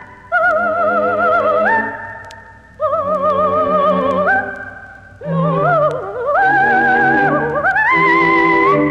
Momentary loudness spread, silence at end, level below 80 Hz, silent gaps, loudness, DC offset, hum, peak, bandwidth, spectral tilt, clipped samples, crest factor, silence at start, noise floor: 11 LU; 0 s; -48 dBFS; none; -14 LUFS; under 0.1%; none; 0 dBFS; 9 kHz; -7.5 dB/octave; under 0.1%; 14 dB; 0 s; -38 dBFS